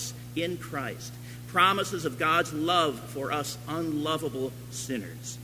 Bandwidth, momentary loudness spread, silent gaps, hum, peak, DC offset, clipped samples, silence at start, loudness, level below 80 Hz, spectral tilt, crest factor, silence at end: 16 kHz; 13 LU; none; 60 Hz at -45 dBFS; -8 dBFS; under 0.1%; under 0.1%; 0 s; -29 LUFS; -58 dBFS; -4 dB/octave; 22 dB; 0 s